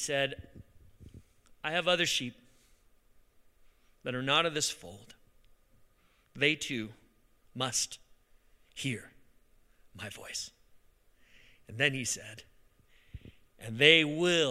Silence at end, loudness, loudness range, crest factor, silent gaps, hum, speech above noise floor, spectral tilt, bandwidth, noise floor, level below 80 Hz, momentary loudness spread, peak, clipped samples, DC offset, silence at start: 0 s; -29 LUFS; 8 LU; 30 dB; none; none; 36 dB; -2.5 dB/octave; 16 kHz; -67 dBFS; -64 dBFS; 24 LU; -4 dBFS; under 0.1%; under 0.1%; 0 s